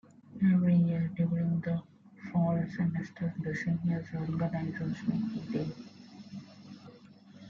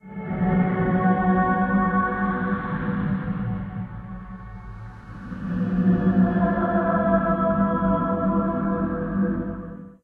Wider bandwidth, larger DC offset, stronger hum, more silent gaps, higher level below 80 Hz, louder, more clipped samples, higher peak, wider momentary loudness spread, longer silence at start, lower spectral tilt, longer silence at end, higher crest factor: first, 6.8 kHz vs 3.7 kHz; neither; neither; neither; second, -64 dBFS vs -40 dBFS; second, -32 LUFS vs -23 LUFS; neither; second, -18 dBFS vs -8 dBFS; first, 22 LU vs 17 LU; first, 0.3 s vs 0.05 s; second, -9.5 dB/octave vs -11.5 dB/octave; about the same, 0 s vs 0.1 s; about the same, 14 dB vs 16 dB